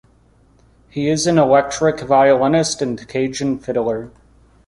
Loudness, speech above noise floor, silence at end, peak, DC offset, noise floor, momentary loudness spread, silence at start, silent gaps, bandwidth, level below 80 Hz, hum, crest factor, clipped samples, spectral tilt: -17 LUFS; 37 dB; 0.6 s; -2 dBFS; under 0.1%; -53 dBFS; 10 LU; 0.95 s; none; 11.5 kHz; -50 dBFS; none; 16 dB; under 0.1%; -5 dB/octave